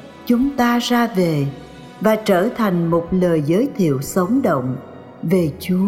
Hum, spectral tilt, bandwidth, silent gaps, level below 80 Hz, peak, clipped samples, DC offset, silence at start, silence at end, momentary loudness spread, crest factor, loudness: none; -6.5 dB/octave; 16.5 kHz; none; -48 dBFS; -4 dBFS; under 0.1%; under 0.1%; 0 s; 0 s; 10 LU; 14 dB; -18 LUFS